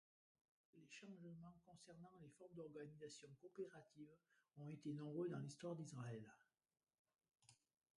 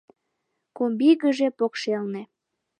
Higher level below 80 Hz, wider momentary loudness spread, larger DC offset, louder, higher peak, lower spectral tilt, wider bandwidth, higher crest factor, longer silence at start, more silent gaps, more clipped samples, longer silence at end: second, under -90 dBFS vs -82 dBFS; first, 15 LU vs 11 LU; neither; second, -56 LUFS vs -23 LUFS; second, -38 dBFS vs -8 dBFS; about the same, -6.5 dB/octave vs -5.5 dB/octave; first, 11 kHz vs 9.6 kHz; about the same, 18 dB vs 18 dB; about the same, 0.75 s vs 0.8 s; first, 6.99-7.05 s vs none; neither; about the same, 0.45 s vs 0.55 s